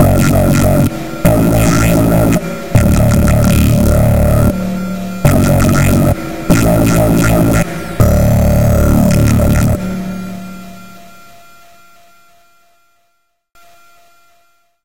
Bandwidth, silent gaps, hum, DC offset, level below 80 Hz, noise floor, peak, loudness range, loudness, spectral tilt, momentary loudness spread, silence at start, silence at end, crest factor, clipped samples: 17.5 kHz; none; none; 3%; -20 dBFS; -63 dBFS; 0 dBFS; 6 LU; -11 LUFS; -6.5 dB/octave; 9 LU; 0 s; 0 s; 12 dB; under 0.1%